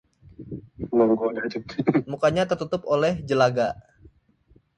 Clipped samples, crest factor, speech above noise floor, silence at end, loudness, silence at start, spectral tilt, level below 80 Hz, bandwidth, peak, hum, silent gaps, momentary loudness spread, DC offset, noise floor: under 0.1%; 18 dB; 37 dB; 1 s; -23 LUFS; 0.4 s; -6.5 dB/octave; -54 dBFS; 10 kHz; -6 dBFS; none; none; 17 LU; under 0.1%; -60 dBFS